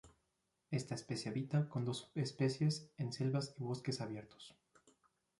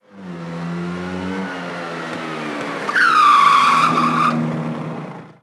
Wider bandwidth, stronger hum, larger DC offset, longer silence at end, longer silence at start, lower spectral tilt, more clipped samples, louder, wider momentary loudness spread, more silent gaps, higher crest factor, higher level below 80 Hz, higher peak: second, 11.5 kHz vs 13.5 kHz; neither; neither; first, 0.9 s vs 0.1 s; about the same, 0.05 s vs 0.15 s; first, -6 dB/octave vs -4.5 dB/octave; neither; second, -41 LUFS vs -17 LUFS; second, 9 LU vs 18 LU; neither; about the same, 18 dB vs 16 dB; second, -76 dBFS vs -62 dBFS; second, -24 dBFS vs -2 dBFS